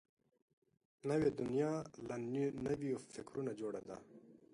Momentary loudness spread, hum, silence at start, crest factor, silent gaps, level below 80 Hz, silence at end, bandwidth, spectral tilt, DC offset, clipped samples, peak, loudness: 12 LU; none; 1.05 s; 18 dB; none; -72 dBFS; 0.15 s; 11.5 kHz; -7 dB/octave; under 0.1%; under 0.1%; -24 dBFS; -41 LUFS